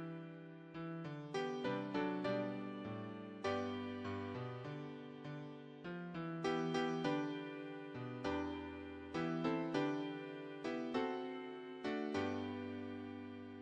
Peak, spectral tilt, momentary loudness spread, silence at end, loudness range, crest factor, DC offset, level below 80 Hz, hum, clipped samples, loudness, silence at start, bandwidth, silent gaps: -24 dBFS; -6.5 dB/octave; 11 LU; 0 s; 3 LU; 18 dB; under 0.1%; -72 dBFS; none; under 0.1%; -43 LUFS; 0 s; 9.4 kHz; none